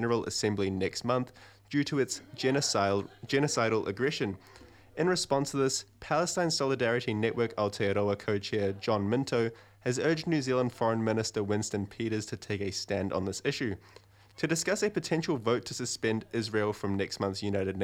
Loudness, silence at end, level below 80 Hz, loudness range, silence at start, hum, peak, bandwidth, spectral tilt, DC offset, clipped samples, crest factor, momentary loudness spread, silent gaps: -31 LUFS; 0 s; -64 dBFS; 3 LU; 0 s; none; -14 dBFS; 16.5 kHz; -4.5 dB/octave; under 0.1%; under 0.1%; 16 dB; 6 LU; none